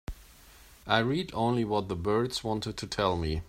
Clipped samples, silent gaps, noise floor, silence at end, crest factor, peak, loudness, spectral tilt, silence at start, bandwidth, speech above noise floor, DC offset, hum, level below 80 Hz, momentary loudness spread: under 0.1%; none; -54 dBFS; 0.05 s; 22 dB; -8 dBFS; -30 LUFS; -5.5 dB/octave; 0.1 s; 16 kHz; 25 dB; under 0.1%; none; -48 dBFS; 11 LU